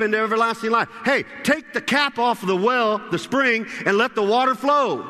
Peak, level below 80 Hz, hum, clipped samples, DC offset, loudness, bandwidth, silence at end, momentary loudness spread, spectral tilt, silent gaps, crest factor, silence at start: -4 dBFS; -64 dBFS; none; under 0.1%; under 0.1%; -20 LUFS; 13.5 kHz; 0 s; 3 LU; -4.5 dB/octave; none; 18 dB; 0 s